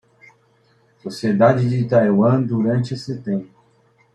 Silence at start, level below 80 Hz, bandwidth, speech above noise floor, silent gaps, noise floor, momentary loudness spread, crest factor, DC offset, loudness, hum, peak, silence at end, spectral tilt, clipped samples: 1.05 s; -60 dBFS; 10.5 kHz; 41 dB; none; -58 dBFS; 12 LU; 18 dB; under 0.1%; -18 LUFS; none; -2 dBFS; 0.7 s; -8.5 dB/octave; under 0.1%